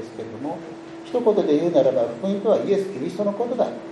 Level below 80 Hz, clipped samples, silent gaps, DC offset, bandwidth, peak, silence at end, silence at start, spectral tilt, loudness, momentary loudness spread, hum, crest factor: -68 dBFS; under 0.1%; none; under 0.1%; 11 kHz; -6 dBFS; 0 s; 0 s; -7 dB/octave; -22 LUFS; 14 LU; none; 16 dB